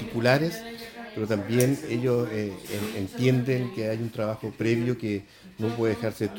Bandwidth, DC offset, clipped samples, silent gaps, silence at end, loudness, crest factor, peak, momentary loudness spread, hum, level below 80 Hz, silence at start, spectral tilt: 17 kHz; under 0.1%; under 0.1%; none; 0 s; -27 LUFS; 20 dB; -6 dBFS; 10 LU; none; -60 dBFS; 0 s; -6.5 dB/octave